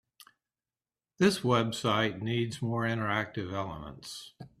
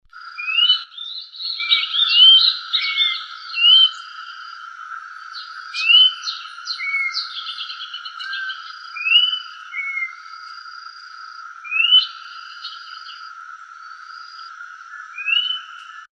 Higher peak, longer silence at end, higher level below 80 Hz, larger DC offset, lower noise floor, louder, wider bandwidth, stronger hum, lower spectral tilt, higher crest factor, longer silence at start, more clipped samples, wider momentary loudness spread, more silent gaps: second, -12 dBFS vs -2 dBFS; about the same, 0.15 s vs 0.15 s; first, -62 dBFS vs -80 dBFS; neither; first, under -90 dBFS vs -39 dBFS; second, -30 LUFS vs -15 LUFS; first, 14.5 kHz vs 9.6 kHz; neither; first, -5.5 dB/octave vs 9.5 dB/octave; about the same, 20 dB vs 18 dB; first, 1.2 s vs 0.15 s; neither; second, 15 LU vs 25 LU; neither